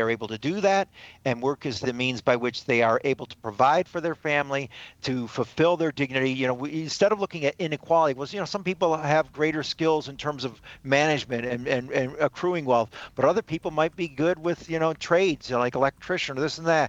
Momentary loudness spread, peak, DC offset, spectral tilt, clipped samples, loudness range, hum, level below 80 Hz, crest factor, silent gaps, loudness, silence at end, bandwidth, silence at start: 8 LU; -6 dBFS; under 0.1%; -5 dB/octave; under 0.1%; 1 LU; none; -60 dBFS; 20 dB; none; -25 LUFS; 0 s; 8.4 kHz; 0 s